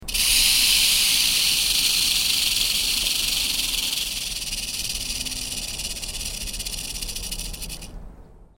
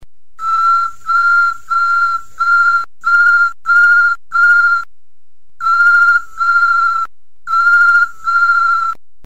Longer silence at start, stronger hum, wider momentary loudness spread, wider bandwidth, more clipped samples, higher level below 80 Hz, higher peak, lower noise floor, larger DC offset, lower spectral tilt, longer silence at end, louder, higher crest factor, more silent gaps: about the same, 0 s vs 0 s; neither; first, 13 LU vs 8 LU; first, 18 kHz vs 10 kHz; neither; first, -38 dBFS vs -52 dBFS; about the same, -4 dBFS vs -2 dBFS; second, -45 dBFS vs -60 dBFS; second, under 0.1% vs 4%; about the same, 1 dB/octave vs 0.5 dB/octave; about the same, 0.2 s vs 0.3 s; second, -20 LUFS vs -11 LUFS; first, 20 dB vs 10 dB; neither